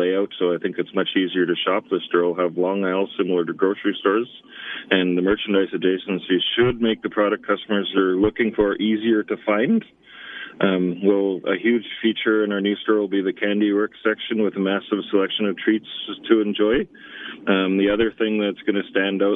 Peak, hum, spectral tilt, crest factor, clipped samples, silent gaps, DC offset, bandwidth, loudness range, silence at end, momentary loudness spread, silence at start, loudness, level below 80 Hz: -2 dBFS; none; -9 dB/octave; 20 dB; under 0.1%; none; under 0.1%; 3.9 kHz; 1 LU; 0 s; 5 LU; 0 s; -21 LUFS; -54 dBFS